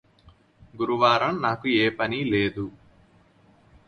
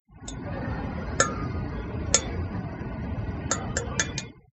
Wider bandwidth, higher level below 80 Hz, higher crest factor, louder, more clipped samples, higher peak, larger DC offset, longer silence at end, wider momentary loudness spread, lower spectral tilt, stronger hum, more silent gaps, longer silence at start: first, 10 kHz vs 8.6 kHz; second, -56 dBFS vs -40 dBFS; second, 20 dB vs 28 dB; first, -23 LUFS vs -29 LUFS; neither; second, -6 dBFS vs -2 dBFS; neither; first, 1.15 s vs 0.15 s; about the same, 11 LU vs 11 LU; first, -6.5 dB/octave vs -3.5 dB/octave; neither; neither; first, 0.75 s vs 0.1 s